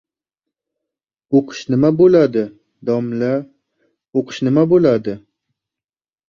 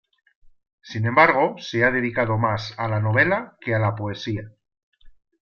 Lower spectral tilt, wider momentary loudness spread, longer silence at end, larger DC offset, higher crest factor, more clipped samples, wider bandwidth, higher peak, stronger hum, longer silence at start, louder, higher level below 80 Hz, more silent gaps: about the same, -8 dB/octave vs -7 dB/octave; about the same, 13 LU vs 13 LU; first, 1.1 s vs 0.35 s; neither; second, 16 dB vs 22 dB; neither; about the same, 7.2 kHz vs 6.8 kHz; about the same, -2 dBFS vs -2 dBFS; neither; first, 1.3 s vs 0.85 s; first, -16 LUFS vs -21 LUFS; about the same, -56 dBFS vs -54 dBFS; second, none vs 4.83-4.92 s